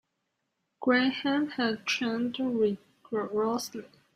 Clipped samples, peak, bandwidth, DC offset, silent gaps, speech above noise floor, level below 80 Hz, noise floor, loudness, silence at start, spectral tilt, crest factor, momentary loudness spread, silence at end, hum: under 0.1%; -12 dBFS; 15.5 kHz; under 0.1%; none; 52 dB; -74 dBFS; -81 dBFS; -29 LUFS; 0.8 s; -4 dB/octave; 18 dB; 10 LU; 0.3 s; none